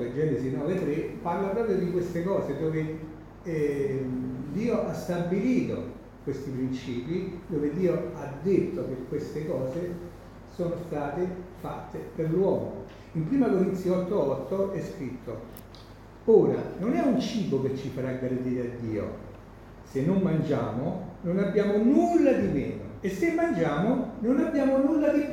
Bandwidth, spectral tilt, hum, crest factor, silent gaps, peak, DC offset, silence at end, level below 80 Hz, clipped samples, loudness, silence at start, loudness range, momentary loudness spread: 17 kHz; -8 dB/octave; none; 20 dB; none; -8 dBFS; under 0.1%; 0 s; -52 dBFS; under 0.1%; -28 LUFS; 0 s; 6 LU; 14 LU